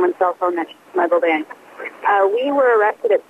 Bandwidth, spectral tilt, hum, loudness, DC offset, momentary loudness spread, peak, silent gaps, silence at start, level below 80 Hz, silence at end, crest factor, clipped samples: 10 kHz; -5 dB/octave; none; -18 LUFS; under 0.1%; 12 LU; -6 dBFS; none; 0 s; -78 dBFS; 0.1 s; 12 dB; under 0.1%